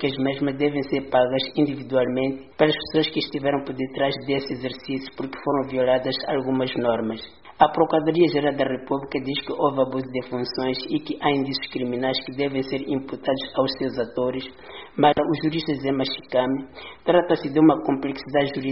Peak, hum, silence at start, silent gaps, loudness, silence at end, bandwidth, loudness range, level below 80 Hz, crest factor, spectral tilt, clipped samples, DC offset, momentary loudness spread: -2 dBFS; none; 0 s; none; -23 LUFS; 0 s; 5.8 kHz; 3 LU; -56 dBFS; 22 dB; -4 dB/octave; under 0.1%; 0.2%; 10 LU